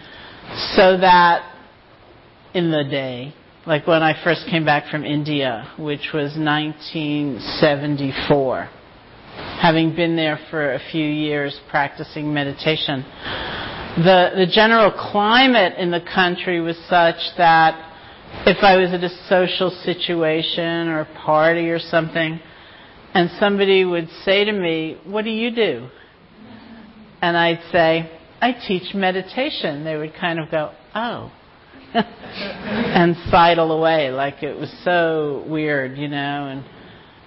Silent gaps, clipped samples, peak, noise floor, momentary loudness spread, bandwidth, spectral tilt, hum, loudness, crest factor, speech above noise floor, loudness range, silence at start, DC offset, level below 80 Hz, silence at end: none; under 0.1%; -4 dBFS; -47 dBFS; 14 LU; 5.8 kHz; -10 dB/octave; none; -18 LUFS; 16 dB; 29 dB; 7 LU; 0 s; under 0.1%; -50 dBFS; 0.3 s